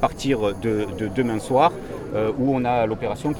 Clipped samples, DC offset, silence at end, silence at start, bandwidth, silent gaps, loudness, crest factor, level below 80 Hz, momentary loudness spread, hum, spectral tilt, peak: under 0.1%; under 0.1%; 0 s; 0 s; 17 kHz; none; -22 LUFS; 18 dB; -44 dBFS; 7 LU; none; -6.5 dB/octave; -4 dBFS